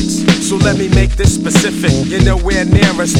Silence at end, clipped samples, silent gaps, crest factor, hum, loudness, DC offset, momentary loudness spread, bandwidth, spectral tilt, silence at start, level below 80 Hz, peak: 0 s; 0.3%; none; 12 dB; none; -12 LUFS; under 0.1%; 3 LU; 16 kHz; -5 dB/octave; 0 s; -20 dBFS; 0 dBFS